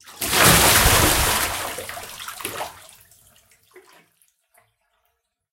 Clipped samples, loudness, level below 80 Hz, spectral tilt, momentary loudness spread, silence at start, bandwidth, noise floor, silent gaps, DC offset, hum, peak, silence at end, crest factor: under 0.1%; -16 LUFS; -34 dBFS; -2 dB/octave; 20 LU; 0.1 s; 17 kHz; -73 dBFS; none; under 0.1%; none; 0 dBFS; 2.8 s; 22 dB